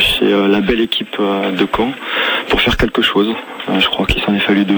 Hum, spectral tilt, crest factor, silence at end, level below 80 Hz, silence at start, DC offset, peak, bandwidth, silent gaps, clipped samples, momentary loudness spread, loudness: none; -5 dB/octave; 14 dB; 0 s; -32 dBFS; 0 s; under 0.1%; -2 dBFS; 19.5 kHz; none; under 0.1%; 5 LU; -14 LUFS